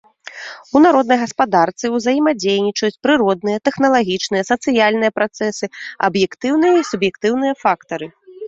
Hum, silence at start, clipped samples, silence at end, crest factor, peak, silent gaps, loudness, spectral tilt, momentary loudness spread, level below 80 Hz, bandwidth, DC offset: none; 0.25 s; under 0.1%; 0 s; 16 dB; 0 dBFS; none; -16 LUFS; -4.5 dB/octave; 12 LU; -58 dBFS; 7.8 kHz; under 0.1%